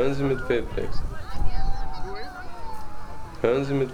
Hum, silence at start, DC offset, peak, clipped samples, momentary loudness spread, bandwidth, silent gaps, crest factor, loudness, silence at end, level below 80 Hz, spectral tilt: none; 0 s; under 0.1%; -8 dBFS; under 0.1%; 15 LU; 8.6 kHz; none; 14 dB; -29 LUFS; 0 s; -32 dBFS; -7 dB/octave